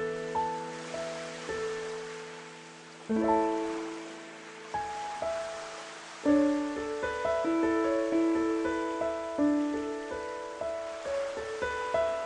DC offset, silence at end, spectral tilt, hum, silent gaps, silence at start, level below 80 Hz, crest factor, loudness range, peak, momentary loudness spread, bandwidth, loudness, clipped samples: under 0.1%; 0 s; -4.5 dB/octave; none; none; 0 s; -60 dBFS; 18 dB; 5 LU; -14 dBFS; 14 LU; 10.5 kHz; -32 LUFS; under 0.1%